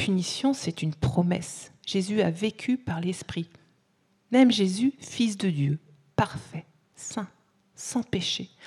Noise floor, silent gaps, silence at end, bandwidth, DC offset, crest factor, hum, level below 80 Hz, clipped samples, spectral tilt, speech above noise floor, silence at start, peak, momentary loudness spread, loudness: -68 dBFS; none; 0 s; 12.5 kHz; under 0.1%; 18 dB; none; -58 dBFS; under 0.1%; -5.5 dB/octave; 42 dB; 0 s; -10 dBFS; 15 LU; -27 LUFS